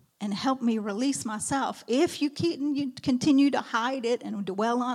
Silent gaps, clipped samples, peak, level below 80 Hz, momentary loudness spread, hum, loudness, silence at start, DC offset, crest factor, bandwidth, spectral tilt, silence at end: none; under 0.1%; -14 dBFS; -68 dBFS; 7 LU; none; -27 LUFS; 0.2 s; under 0.1%; 14 dB; 13.5 kHz; -4.5 dB/octave; 0 s